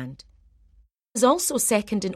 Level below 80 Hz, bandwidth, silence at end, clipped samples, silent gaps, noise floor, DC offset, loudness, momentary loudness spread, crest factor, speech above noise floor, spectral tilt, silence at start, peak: -58 dBFS; 16 kHz; 0 s; under 0.1%; none; -59 dBFS; under 0.1%; -22 LUFS; 13 LU; 20 dB; 36 dB; -3.5 dB/octave; 0 s; -6 dBFS